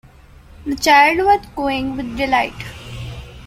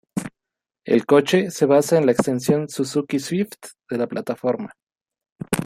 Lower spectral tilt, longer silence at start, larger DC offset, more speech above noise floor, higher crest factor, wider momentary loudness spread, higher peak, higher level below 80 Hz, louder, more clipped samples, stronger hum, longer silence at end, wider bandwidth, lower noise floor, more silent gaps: second, -4 dB/octave vs -5.5 dB/octave; first, 0.6 s vs 0.15 s; neither; second, 27 dB vs 67 dB; about the same, 18 dB vs 20 dB; first, 21 LU vs 17 LU; about the same, 0 dBFS vs -2 dBFS; first, -40 dBFS vs -60 dBFS; first, -16 LUFS vs -21 LUFS; neither; neither; about the same, 0 s vs 0 s; about the same, 16 kHz vs 16 kHz; second, -43 dBFS vs -86 dBFS; second, none vs 4.83-4.87 s, 5.32-5.36 s